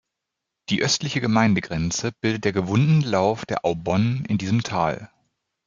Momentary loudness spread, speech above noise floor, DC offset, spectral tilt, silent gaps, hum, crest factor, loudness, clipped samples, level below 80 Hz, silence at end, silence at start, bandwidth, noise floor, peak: 6 LU; 61 dB; under 0.1%; -5.5 dB/octave; none; none; 18 dB; -22 LUFS; under 0.1%; -54 dBFS; 0.6 s; 0.7 s; 7.6 kHz; -83 dBFS; -4 dBFS